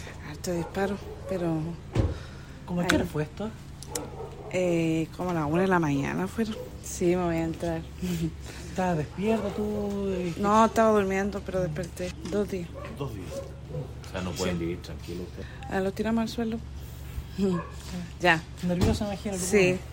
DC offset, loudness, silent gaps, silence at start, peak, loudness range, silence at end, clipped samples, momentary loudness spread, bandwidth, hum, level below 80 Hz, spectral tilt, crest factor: under 0.1%; -29 LUFS; none; 0 s; -2 dBFS; 7 LU; 0 s; under 0.1%; 14 LU; 16 kHz; none; -44 dBFS; -5.5 dB/octave; 26 dB